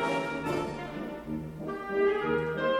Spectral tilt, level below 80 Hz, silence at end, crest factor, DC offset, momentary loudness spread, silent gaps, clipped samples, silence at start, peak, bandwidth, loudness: -6 dB/octave; -54 dBFS; 0 s; 14 dB; under 0.1%; 10 LU; none; under 0.1%; 0 s; -16 dBFS; 16 kHz; -32 LUFS